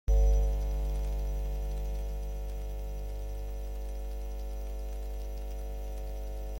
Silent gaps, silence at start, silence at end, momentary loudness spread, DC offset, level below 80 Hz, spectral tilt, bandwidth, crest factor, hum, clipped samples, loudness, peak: none; 0.05 s; 0 s; 9 LU; under 0.1%; -32 dBFS; -6.5 dB/octave; 17 kHz; 14 dB; 50 Hz at -35 dBFS; under 0.1%; -37 LUFS; -18 dBFS